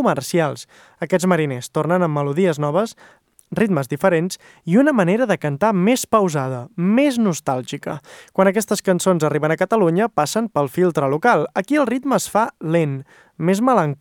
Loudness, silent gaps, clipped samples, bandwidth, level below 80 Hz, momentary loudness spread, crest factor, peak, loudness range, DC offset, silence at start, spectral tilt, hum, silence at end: -19 LUFS; none; under 0.1%; 18.5 kHz; -62 dBFS; 9 LU; 16 dB; -2 dBFS; 2 LU; under 0.1%; 0 s; -6 dB/octave; none; 0.05 s